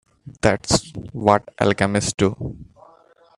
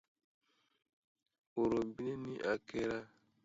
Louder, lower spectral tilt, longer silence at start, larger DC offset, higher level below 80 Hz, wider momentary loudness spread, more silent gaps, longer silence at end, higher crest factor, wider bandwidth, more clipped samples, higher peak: first, -20 LUFS vs -39 LUFS; about the same, -4.5 dB/octave vs -5 dB/octave; second, 0.25 s vs 1.55 s; neither; first, -44 dBFS vs -70 dBFS; first, 14 LU vs 8 LU; neither; first, 0.75 s vs 0.4 s; about the same, 22 dB vs 20 dB; first, 12.5 kHz vs 7.6 kHz; neither; first, 0 dBFS vs -22 dBFS